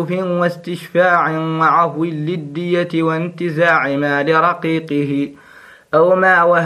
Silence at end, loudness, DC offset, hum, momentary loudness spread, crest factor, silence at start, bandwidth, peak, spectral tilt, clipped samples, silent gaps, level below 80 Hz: 0 s; -16 LUFS; under 0.1%; none; 10 LU; 16 dB; 0 s; 12.5 kHz; 0 dBFS; -7 dB/octave; under 0.1%; none; -64 dBFS